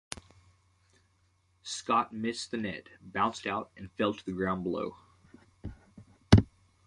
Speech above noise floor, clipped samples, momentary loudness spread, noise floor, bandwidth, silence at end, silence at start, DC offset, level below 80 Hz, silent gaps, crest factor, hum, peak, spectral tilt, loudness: 37 dB; under 0.1%; 22 LU; -70 dBFS; 11.5 kHz; 0.4 s; 0.1 s; under 0.1%; -46 dBFS; none; 28 dB; none; -4 dBFS; -6 dB/octave; -31 LUFS